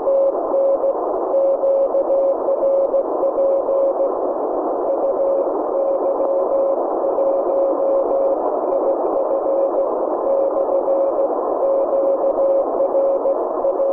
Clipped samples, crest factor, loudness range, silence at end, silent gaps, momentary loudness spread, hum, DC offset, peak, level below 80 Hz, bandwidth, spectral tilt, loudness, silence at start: under 0.1%; 10 dB; 1 LU; 0 s; none; 3 LU; none; under 0.1%; -8 dBFS; -56 dBFS; 2.5 kHz; -9 dB/octave; -18 LUFS; 0 s